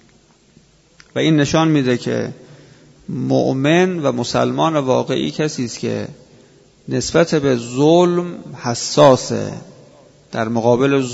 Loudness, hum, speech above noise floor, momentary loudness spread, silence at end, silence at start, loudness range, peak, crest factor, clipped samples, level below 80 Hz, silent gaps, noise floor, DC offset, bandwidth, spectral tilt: -17 LUFS; none; 36 dB; 14 LU; 0 s; 1.15 s; 4 LU; 0 dBFS; 18 dB; under 0.1%; -50 dBFS; none; -52 dBFS; under 0.1%; 8 kHz; -5.5 dB/octave